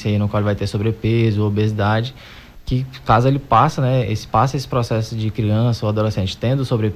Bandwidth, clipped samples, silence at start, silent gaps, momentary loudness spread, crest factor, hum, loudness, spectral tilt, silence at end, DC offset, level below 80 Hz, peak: 13.5 kHz; under 0.1%; 0 s; none; 8 LU; 14 dB; none; -19 LUFS; -7.5 dB/octave; 0 s; under 0.1%; -38 dBFS; -4 dBFS